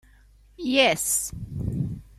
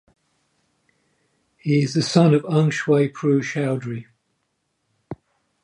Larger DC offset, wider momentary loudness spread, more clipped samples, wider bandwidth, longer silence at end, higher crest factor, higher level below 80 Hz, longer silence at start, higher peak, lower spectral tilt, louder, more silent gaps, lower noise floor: neither; second, 13 LU vs 23 LU; neither; first, 16 kHz vs 11 kHz; second, 0.15 s vs 0.5 s; about the same, 20 dB vs 20 dB; first, -46 dBFS vs -66 dBFS; second, 0.6 s vs 1.65 s; about the same, -6 dBFS vs -4 dBFS; second, -3 dB/octave vs -6.5 dB/octave; second, -24 LUFS vs -20 LUFS; neither; second, -54 dBFS vs -73 dBFS